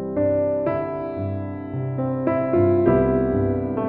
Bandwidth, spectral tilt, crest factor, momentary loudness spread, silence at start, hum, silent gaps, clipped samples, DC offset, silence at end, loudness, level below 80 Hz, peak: 4.3 kHz; -13 dB/octave; 16 dB; 10 LU; 0 s; none; none; under 0.1%; under 0.1%; 0 s; -22 LUFS; -42 dBFS; -4 dBFS